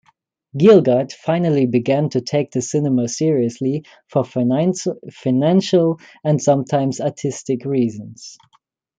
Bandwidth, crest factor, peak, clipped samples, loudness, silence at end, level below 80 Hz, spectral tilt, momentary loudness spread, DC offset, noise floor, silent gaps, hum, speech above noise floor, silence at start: 9.4 kHz; 16 dB; -2 dBFS; under 0.1%; -18 LUFS; 0.65 s; -62 dBFS; -6.5 dB/octave; 11 LU; under 0.1%; -61 dBFS; none; none; 44 dB; 0.55 s